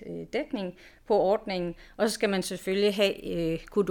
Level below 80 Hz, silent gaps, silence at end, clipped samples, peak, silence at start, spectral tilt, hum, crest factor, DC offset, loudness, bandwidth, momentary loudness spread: -54 dBFS; none; 0 s; under 0.1%; -10 dBFS; 0 s; -5 dB/octave; none; 18 dB; under 0.1%; -28 LUFS; 18 kHz; 10 LU